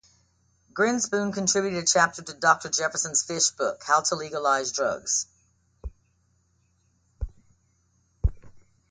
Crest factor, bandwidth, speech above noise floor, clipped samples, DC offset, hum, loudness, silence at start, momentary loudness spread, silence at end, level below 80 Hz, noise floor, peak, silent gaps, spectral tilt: 22 dB; 10.5 kHz; 43 dB; under 0.1%; under 0.1%; none; -24 LUFS; 0.75 s; 18 LU; 0.3 s; -40 dBFS; -68 dBFS; -6 dBFS; none; -2.5 dB/octave